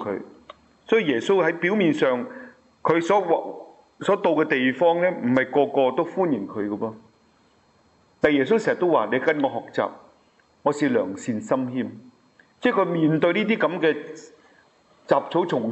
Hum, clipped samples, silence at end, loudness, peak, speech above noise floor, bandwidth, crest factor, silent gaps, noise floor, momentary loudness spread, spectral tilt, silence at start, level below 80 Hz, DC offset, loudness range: none; under 0.1%; 0 s; -22 LUFS; -4 dBFS; 38 dB; 8.2 kHz; 18 dB; none; -60 dBFS; 10 LU; -6.5 dB/octave; 0 s; -68 dBFS; under 0.1%; 3 LU